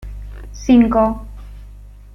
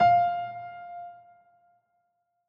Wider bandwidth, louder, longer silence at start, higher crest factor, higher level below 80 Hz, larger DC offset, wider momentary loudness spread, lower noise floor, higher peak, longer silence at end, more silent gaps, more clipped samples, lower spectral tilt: first, 6.4 kHz vs 5.4 kHz; first, -15 LUFS vs -27 LUFS; about the same, 0.05 s vs 0 s; about the same, 16 dB vs 18 dB; first, -32 dBFS vs -66 dBFS; neither; first, 24 LU vs 20 LU; second, -38 dBFS vs -76 dBFS; first, -2 dBFS vs -12 dBFS; second, 0.4 s vs 1.35 s; neither; neither; about the same, -7 dB/octave vs -6.5 dB/octave